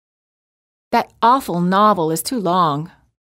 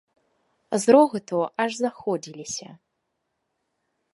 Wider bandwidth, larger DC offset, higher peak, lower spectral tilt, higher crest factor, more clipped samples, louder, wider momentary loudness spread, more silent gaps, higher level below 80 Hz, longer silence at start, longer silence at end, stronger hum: first, 16 kHz vs 11.5 kHz; neither; about the same, -4 dBFS vs -2 dBFS; about the same, -5 dB/octave vs -4.5 dB/octave; second, 16 dB vs 22 dB; neither; first, -17 LUFS vs -23 LUFS; second, 7 LU vs 16 LU; neither; first, -58 dBFS vs -72 dBFS; first, 0.9 s vs 0.7 s; second, 0.55 s vs 1.4 s; neither